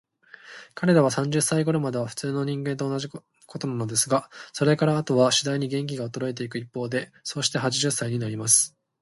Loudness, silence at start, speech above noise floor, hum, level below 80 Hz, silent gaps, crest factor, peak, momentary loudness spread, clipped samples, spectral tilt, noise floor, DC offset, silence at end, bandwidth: -24 LUFS; 0.45 s; 24 dB; none; -66 dBFS; none; 20 dB; -4 dBFS; 13 LU; under 0.1%; -4 dB/octave; -49 dBFS; under 0.1%; 0.35 s; 12 kHz